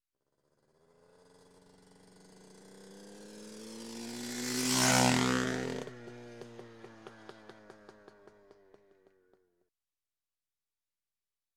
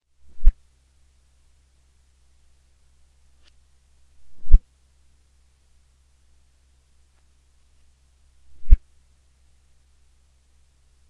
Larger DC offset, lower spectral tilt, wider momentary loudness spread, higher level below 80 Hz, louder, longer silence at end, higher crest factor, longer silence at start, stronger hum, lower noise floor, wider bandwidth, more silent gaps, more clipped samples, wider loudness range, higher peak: neither; second, -3 dB/octave vs -8 dB/octave; first, 29 LU vs 25 LU; second, -66 dBFS vs -24 dBFS; second, -31 LUFS vs -24 LUFS; first, 3.65 s vs 2.35 s; first, 28 dB vs 22 dB; first, 2.6 s vs 0.35 s; neither; first, under -90 dBFS vs -59 dBFS; first, 20 kHz vs 0.5 kHz; neither; neither; first, 22 LU vs 0 LU; second, -10 dBFS vs 0 dBFS